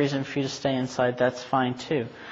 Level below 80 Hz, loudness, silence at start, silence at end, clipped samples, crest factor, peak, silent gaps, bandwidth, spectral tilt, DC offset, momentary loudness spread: -62 dBFS; -27 LUFS; 0 s; 0 s; under 0.1%; 18 dB; -10 dBFS; none; 8 kHz; -5.5 dB/octave; under 0.1%; 5 LU